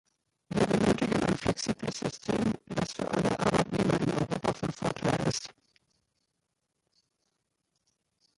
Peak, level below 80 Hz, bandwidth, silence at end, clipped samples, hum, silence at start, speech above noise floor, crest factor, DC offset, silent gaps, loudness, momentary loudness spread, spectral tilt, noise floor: -12 dBFS; -54 dBFS; 11.5 kHz; 2.85 s; under 0.1%; none; 0.5 s; 51 dB; 18 dB; under 0.1%; none; -30 LUFS; 7 LU; -5.5 dB/octave; -82 dBFS